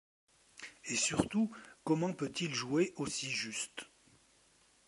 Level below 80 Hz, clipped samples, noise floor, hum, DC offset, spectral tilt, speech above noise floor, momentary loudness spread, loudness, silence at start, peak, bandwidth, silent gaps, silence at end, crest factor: -68 dBFS; under 0.1%; -68 dBFS; none; under 0.1%; -3.5 dB/octave; 33 dB; 16 LU; -35 LUFS; 0.55 s; -16 dBFS; 11.5 kHz; none; 1 s; 22 dB